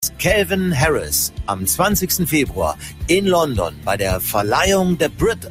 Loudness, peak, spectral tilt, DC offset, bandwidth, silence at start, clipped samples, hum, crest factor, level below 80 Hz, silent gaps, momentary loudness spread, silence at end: -18 LUFS; -2 dBFS; -4 dB/octave; under 0.1%; 16 kHz; 0 s; under 0.1%; none; 16 dB; -34 dBFS; none; 6 LU; 0 s